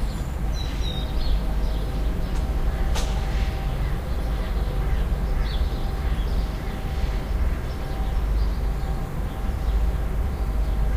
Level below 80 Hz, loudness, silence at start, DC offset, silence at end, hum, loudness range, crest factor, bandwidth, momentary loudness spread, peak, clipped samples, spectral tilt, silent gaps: -24 dBFS; -28 LUFS; 0 s; under 0.1%; 0 s; none; 1 LU; 12 dB; 15.5 kHz; 3 LU; -12 dBFS; under 0.1%; -6 dB/octave; none